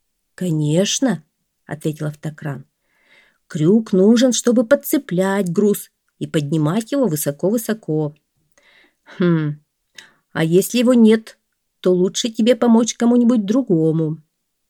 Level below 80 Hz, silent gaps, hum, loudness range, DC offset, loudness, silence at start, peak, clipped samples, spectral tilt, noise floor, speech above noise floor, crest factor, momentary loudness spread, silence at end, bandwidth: -66 dBFS; none; none; 7 LU; under 0.1%; -17 LUFS; 0.4 s; 0 dBFS; under 0.1%; -5.5 dB/octave; -57 dBFS; 41 dB; 18 dB; 14 LU; 0.55 s; 18 kHz